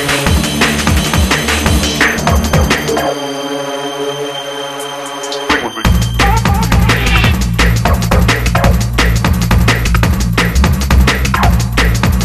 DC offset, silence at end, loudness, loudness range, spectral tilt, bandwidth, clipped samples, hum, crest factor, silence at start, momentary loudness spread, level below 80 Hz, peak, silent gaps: under 0.1%; 0 s; -12 LUFS; 5 LU; -4.5 dB/octave; 13.5 kHz; under 0.1%; none; 12 dB; 0 s; 8 LU; -16 dBFS; 0 dBFS; none